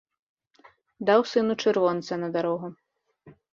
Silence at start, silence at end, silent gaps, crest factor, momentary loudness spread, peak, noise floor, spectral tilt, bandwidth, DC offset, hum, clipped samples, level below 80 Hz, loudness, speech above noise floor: 1 s; 0.2 s; none; 20 dB; 9 LU; -6 dBFS; -58 dBFS; -5.5 dB/octave; 7.4 kHz; under 0.1%; none; under 0.1%; -72 dBFS; -25 LUFS; 34 dB